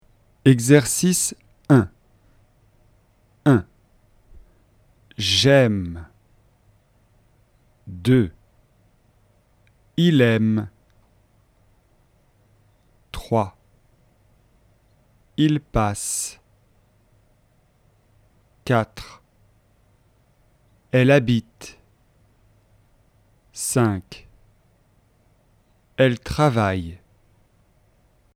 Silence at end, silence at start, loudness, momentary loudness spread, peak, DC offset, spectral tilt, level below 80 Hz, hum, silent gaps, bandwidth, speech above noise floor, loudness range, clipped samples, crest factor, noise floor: 1.4 s; 0.45 s; -20 LUFS; 24 LU; 0 dBFS; under 0.1%; -5 dB/octave; -48 dBFS; none; none; 16 kHz; 42 dB; 9 LU; under 0.1%; 24 dB; -60 dBFS